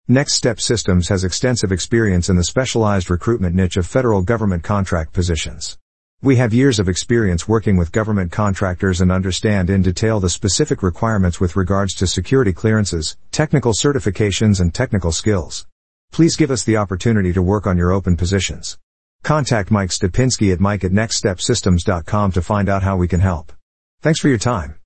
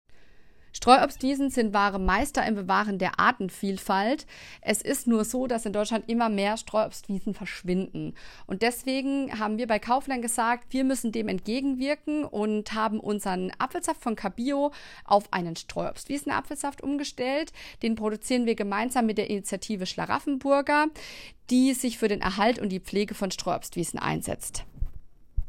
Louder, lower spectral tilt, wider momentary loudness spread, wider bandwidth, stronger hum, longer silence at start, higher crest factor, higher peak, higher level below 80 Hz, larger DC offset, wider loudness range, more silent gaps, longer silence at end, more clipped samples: first, -17 LUFS vs -27 LUFS; about the same, -5.5 dB/octave vs -4.5 dB/octave; second, 4 LU vs 9 LU; second, 8.8 kHz vs 16 kHz; neither; about the same, 0.05 s vs 0.1 s; second, 14 dB vs 24 dB; about the same, -2 dBFS vs -2 dBFS; first, -36 dBFS vs -46 dBFS; first, 1% vs under 0.1%; second, 1 LU vs 4 LU; first, 5.81-6.18 s, 15.72-16.08 s, 18.83-19.19 s, 23.63-23.98 s vs none; about the same, 0.1 s vs 0 s; neither